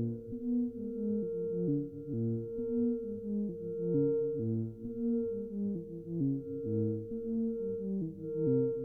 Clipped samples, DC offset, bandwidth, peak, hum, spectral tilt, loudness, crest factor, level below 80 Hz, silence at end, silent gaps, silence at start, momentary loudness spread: under 0.1%; under 0.1%; 1.5 kHz; -20 dBFS; none; -14 dB/octave; -35 LUFS; 14 dB; -62 dBFS; 0 s; none; 0 s; 6 LU